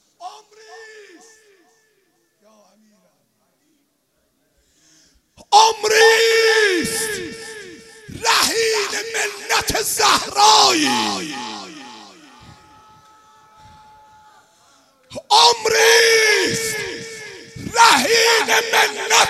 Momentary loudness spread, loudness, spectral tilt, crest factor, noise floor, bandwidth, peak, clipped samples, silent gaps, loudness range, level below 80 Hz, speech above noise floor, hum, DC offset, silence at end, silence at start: 22 LU; -14 LUFS; -0.5 dB/octave; 18 dB; -66 dBFS; 15.5 kHz; 0 dBFS; under 0.1%; none; 7 LU; -54 dBFS; 51 dB; none; under 0.1%; 0 s; 0.2 s